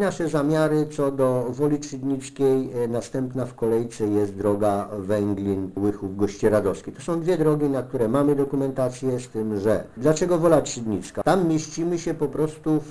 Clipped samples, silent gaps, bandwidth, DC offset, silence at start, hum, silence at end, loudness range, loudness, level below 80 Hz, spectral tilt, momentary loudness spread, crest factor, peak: under 0.1%; none; 11 kHz; under 0.1%; 0 s; none; 0 s; 2 LU; -24 LUFS; -50 dBFS; -6.5 dB/octave; 7 LU; 18 dB; -4 dBFS